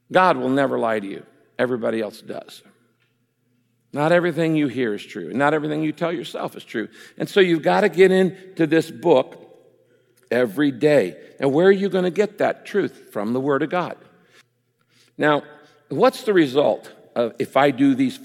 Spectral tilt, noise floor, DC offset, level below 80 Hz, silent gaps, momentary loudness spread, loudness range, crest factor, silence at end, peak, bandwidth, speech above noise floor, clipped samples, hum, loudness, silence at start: -6.5 dB/octave; -67 dBFS; under 0.1%; -72 dBFS; none; 13 LU; 6 LU; 18 dB; 0 s; -2 dBFS; 16 kHz; 47 dB; under 0.1%; none; -20 LUFS; 0.1 s